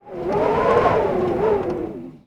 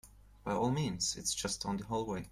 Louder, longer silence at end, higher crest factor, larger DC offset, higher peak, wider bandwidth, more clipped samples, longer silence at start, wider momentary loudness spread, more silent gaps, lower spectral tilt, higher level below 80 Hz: first, -20 LUFS vs -35 LUFS; about the same, 0.1 s vs 0 s; about the same, 18 dB vs 16 dB; neither; first, -4 dBFS vs -20 dBFS; second, 10 kHz vs 16 kHz; neither; about the same, 0.05 s vs 0.05 s; first, 10 LU vs 4 LU; neither; first, -7.5 dB/octave vs -4 dB/octave; first, -44 dBFS vs -58 dBFS